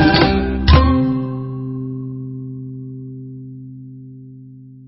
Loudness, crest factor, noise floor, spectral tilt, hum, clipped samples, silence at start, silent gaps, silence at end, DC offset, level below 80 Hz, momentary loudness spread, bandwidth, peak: -17 LUFS; 18 dB; -39 dBFS; -9.5 dB/octave; none; under 0.1%; 0 s; none; 0 s; under 0.1%; -24 dBFS; 25 LU; 5.8 kHz; 0 dBFS